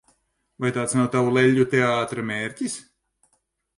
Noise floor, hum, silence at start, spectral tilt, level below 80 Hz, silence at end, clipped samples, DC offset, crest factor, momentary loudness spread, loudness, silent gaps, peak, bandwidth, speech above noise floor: -71 dBFS; none; 0.6 s; -5.5 dB/octave; -62 dBFS; 0.95 s; under 0.1%; under 0.1%; 18 dB; 11 LU; -22 LUFS; none; -6 dBFS; 11.5 kHz; 50 dB